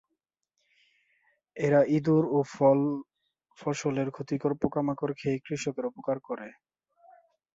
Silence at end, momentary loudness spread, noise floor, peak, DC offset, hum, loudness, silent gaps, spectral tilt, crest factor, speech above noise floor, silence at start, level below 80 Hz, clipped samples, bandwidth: 1.05 s; 14 LU; -83 dBFS; -10 dBFS; under 0.1%; none; -28 LUFS; none; -7 dB/octave; 20 dB; 56 dB; 1.55 s; -66 dBFS; under 0.1%; 8 kHz